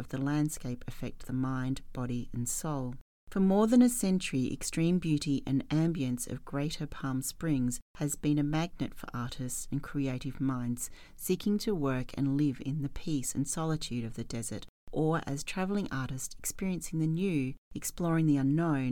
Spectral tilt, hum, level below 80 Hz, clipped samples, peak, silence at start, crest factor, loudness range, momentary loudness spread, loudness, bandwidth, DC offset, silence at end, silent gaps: -5.5 dB/octave; none; -48 dBFS; under 0.1%; -14 dBFS; 0 s; 18 dB; 5 LU; 10 LU; -32 LUFS; 18.5 kHz; under 0.1%; 0 s; 3.01-3.27 s, 7.82-7.94 s, 14.69-14.87 s, 17.58-17.71 s